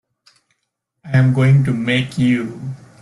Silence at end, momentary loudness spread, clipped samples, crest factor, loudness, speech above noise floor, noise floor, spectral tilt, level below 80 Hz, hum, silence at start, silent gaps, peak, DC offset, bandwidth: 0.25 s; 15 LU; under 0.1%; 14 dB; -16 LUFS; 59 dB; -74 dBFS; -7.5 dB/octave; -52 dBFS; none; 1.05 s; none; -4 dBFS; under 0.1%; 11 kHz